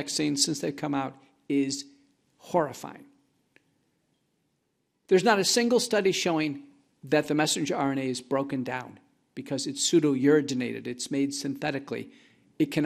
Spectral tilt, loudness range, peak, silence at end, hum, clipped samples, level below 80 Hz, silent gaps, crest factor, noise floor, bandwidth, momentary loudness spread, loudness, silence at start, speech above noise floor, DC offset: -4 dB/octave; 8 LU; -8 dBFS; 0 s; none; under 0.1%; -72 dBFS; none; 20 dB; -76 dBFS; 15 kHz; 15 LU; -27 LUFS; 0 s; 49 dB; under 0.1%